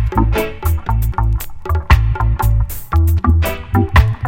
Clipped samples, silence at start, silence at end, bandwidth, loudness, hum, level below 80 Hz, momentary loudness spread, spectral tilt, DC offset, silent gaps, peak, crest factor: under 0.1%; 0 s; 0 s; 17 kHz; -16 LUFS; none; -18 dBFS; 6 LU; -6.5 dB/octave; under 0.1%; none; 0 dBFS; 14 dB